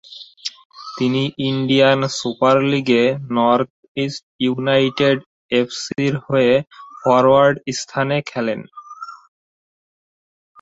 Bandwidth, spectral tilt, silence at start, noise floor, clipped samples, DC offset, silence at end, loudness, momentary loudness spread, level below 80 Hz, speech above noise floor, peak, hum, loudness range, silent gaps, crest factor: 8 kHz; -5.5 dB/octave; 0.1 s; under -90 dBFS; under 0.1%; under 0.1%; 1.45 s; -18 LUFS; 16 LU; -58 dBFS; over 73 dB; -2 dBFS; none; 2 LU; 0.65-0.70 s, 3.70-3.95 s, 4.23-4.39 s, 5.26-5.49 s; 18 dB